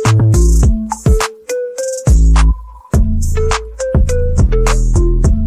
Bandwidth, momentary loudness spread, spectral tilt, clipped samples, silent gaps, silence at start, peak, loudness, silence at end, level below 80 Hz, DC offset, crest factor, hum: 13.5 kHz; 8 LU; -6 dB/octave; under 0.1%; none; 0 s; -2 dBFS; -14 LUFS; 0 s; -12 dBFS; under 0.1%; 10 dB; none